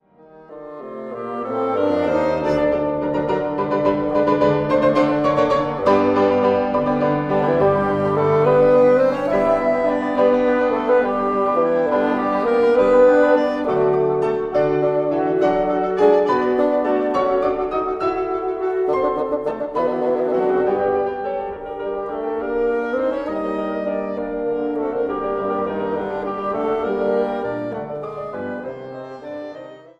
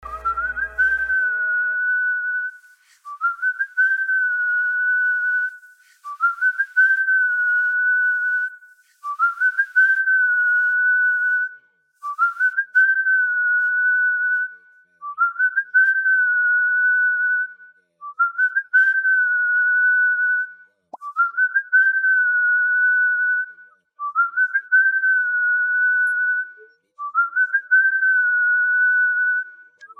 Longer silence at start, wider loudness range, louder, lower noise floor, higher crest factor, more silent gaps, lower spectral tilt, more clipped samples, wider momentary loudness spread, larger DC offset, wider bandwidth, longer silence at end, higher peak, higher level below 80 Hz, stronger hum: first, 0.35 s vs 0.05 s; first, 7 LU vs 2 LU; about the same, -19 LUFS vs -18 LUFS; second, -46 dBFS vs -51 dBFS; first, 18 dB vs 12 dB; neither; first, -8 dB/octave vs -1.5 dB/octave; neither; first, 12 LU vs 9 LU; neither; first, 7.8 kHz vs 3.4 kHz; about the same, 0.2 s vs 0.15 s; first, -2 dBFS vs -8 dBFS; first, -48 dBFS vs -58 dBFS; neither